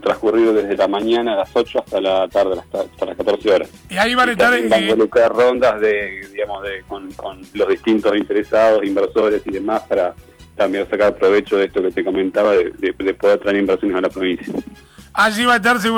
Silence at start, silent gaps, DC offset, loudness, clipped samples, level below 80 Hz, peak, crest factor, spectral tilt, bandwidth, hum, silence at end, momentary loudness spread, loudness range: 0 s; none; under 0.1%; -17 LUFS; under 0.1%; -48 dBFS; -4 dBFS; 14 dB; -4.5 dB/octave; 19.5 kHz; none; 0 s; 11 LU; 3 LU